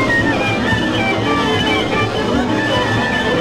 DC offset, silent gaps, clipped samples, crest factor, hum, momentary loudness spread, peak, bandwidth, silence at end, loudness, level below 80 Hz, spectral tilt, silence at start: under 0.1%; none; under 0.1%; 14 dB; none; 2 LU; -2 dBFS; 15 kHz; 0 s; -16 LUFS; -34 dBFS; -5 dB/octave; 0 s